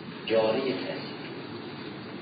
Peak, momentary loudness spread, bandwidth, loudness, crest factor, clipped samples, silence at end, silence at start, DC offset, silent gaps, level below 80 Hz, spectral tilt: -14 dBFS; 14 LU; 5 kHz; -31 LUFS; 18 dB; under 0.1%; 0 s; 0 s; under 0.1%; none; -74 dBFS; -9.5 dB/octave